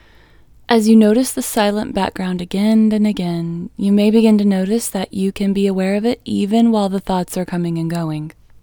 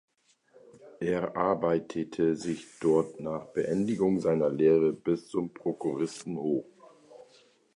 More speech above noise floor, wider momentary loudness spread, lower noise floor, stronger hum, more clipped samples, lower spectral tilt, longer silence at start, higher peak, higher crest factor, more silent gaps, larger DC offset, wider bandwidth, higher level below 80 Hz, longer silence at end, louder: second, 31 dB vs 35 dB; about the same, 10 LU vs 9 LU; second, -47 dBFS vs -63 dBFS; neither; neither; about the same, -6 dB/octave vs -7 dB/octave; second, 0.7 s vs 0.85 s; first, 0 dBFS vs -12 dBFS; about the same, 16 dB vs 18 dB; neither; neither; first, 20 kHz vs 11 kHz; first, -46 dBFS vs -64 dBFS; second, 0.35 s vs 0.55 s; first, -16 LUFS vs -29 LUFS